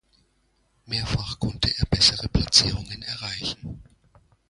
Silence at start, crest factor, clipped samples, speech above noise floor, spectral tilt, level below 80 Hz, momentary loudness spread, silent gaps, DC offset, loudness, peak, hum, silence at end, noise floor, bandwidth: 0.9 s; 24 dB; under 0.1%; 43 dB; -3 dB/octave; -38 dBFS; 14 LU; none; under 0.1%; -22 LUFS; -2 dBFS; none; 0.7 s; -67 dBFS; 11.5 kHz